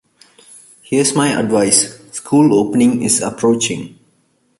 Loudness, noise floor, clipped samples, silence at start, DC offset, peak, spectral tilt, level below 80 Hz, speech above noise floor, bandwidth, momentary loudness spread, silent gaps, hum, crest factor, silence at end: -14 LUFS; -60 dBFS; under 0.1%; 0.9 s; under 0.1%; 0 dBFS; -4 dB/octave; -54 dBFS; 46 dB; 12 kHz; 9 LU; none; none; 16 dB; 0.7 s